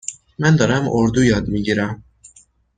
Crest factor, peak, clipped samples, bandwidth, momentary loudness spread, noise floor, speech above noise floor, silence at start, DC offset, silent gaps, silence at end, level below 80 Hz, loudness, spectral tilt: 18 dB; -2 dBFS; under 0.1%; 9.4 kHz; 11 LU; -52 dBFS; 35 dB; 0.1 s; under 0.1%; none; 0.8 s; -40 dBFS; -17 LUFS; -6 dB/octave